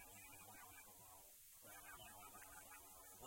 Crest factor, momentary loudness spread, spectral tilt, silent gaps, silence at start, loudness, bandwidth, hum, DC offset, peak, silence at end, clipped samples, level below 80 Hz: 16 dB; 3 LU; -1.5 dB/octave; none; 0 s; -59 LUFS; 16.5 kHz; none; under 0.1%; -46 dBFS; 0 s; under 0.1%; -78 dBFS